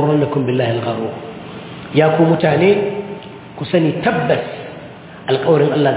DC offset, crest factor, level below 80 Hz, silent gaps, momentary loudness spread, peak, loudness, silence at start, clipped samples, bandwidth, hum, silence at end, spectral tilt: under 0.1%; 16 dB; -52 dBFS; none; 18 LU; 0 dBFS; -16 LUFS; 0 s; under 0.1%; 4 kHz; none; 0 s; -11 dB/octave